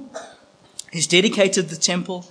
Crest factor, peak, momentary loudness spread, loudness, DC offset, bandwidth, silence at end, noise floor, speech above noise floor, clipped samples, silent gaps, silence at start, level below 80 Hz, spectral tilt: 22 dB; 0 dBFS; 22 LU; -18 LUFS; under 0.1%; 10.5 kHz; 0.05 s; -50 dBFS; 31 dB; under 0.1%; none; 0 s; -74 dBFS; -3 dB/octave